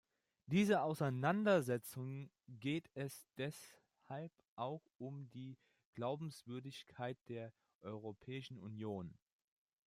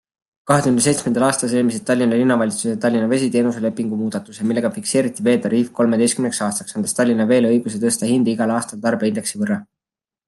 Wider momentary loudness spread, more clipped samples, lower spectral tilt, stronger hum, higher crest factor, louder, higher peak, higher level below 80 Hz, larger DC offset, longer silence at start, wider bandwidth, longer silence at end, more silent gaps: first, 19 LU vs 7 LU; neither; first, -6.5 dB/octave vs -5 dB/octave; neither; about the same, 20 dB vs 16 dB; second, -43 LUFS vs -18 LUFS; second, -22 dBFS vs -2 dBFS; second, -82 dBFS vs -62 dBFS; neither; about the same, 0.5 s vs 0.45 s; first, 16 kHz vs 12.5 kHz; about the same, 0.75 s vs 0.65 s; first, 4.48-4.57 s, 5.85-5.93 s, 7.21-7.26 s, 7.75-7.81 s vs none